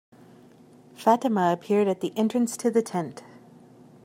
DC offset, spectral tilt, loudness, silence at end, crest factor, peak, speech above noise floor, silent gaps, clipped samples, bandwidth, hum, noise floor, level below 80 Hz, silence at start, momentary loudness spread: under 0.1%; -6 dB/octave; -25 LUFS; 0.85 s; 20 dB; -6 dBFS; 29 dB; none; under 0.1%; 16 kHz; none; -52 dBFS; -78 dBFS; 1 s; 9 LU